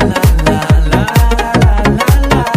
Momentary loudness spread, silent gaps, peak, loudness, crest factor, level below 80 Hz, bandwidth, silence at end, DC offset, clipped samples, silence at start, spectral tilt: 1 LU; none; 0 dBFS; -11 LUFS; 10 dB; -12 dBFS; 16 kHz; 0 s; under 0.1%; under 0.1%; 0 s; -6 dB/octave